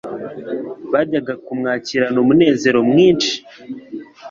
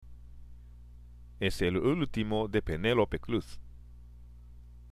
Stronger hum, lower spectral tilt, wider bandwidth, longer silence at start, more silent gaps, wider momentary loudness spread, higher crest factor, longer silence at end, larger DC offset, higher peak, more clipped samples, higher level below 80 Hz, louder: second, none vs 60 Hz at -50 dBFS; second, -5 dB/octave vs -6.5 dB/octave; second, 7.6 kHz vs 15 kHz; about the same, 0.05 s vs 0 s; neither; first, 19 LU vs 7 LU; about the same, 16 dB vs 20 dB; about the same, 0 s vs 0 s; neither; first, -2 dBFS vs -14 dBFS; neither; second, -56 dBFS vs -46 dBFS; first, -16 LUFS vs -31 LUFS